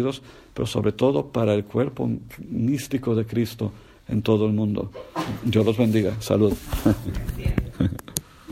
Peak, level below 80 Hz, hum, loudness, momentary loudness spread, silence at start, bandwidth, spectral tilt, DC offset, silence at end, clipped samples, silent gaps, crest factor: 0 dBFS; -38 dBFS; none; -24 LUFS; 10 LU; 0 s; 16 kHz; -6.5 dB/octave; under 0.1%; 0 s; under 0.1%; none; 24 dB